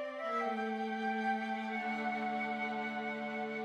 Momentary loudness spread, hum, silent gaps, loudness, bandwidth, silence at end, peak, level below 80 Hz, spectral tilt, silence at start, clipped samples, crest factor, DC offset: 3 LU; none; none; -37 LUFS; 9.4 kHz; 0 s; -24 dBFS; -82 dBFS; -5.5 dB/octave; 0 s; under 0.1%; 14 dB; under 0.1%